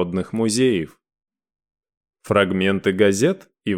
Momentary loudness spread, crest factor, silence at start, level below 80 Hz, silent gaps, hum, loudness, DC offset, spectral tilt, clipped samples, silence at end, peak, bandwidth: 8 LU; 18 dB; 0 s; -58 dBFS; 1.97-2.01 s; none; -20 LUFS; under 0.1%; -5 dB/octave; under 0.1%; 0 s; -4 dBFS; 15.5 kHz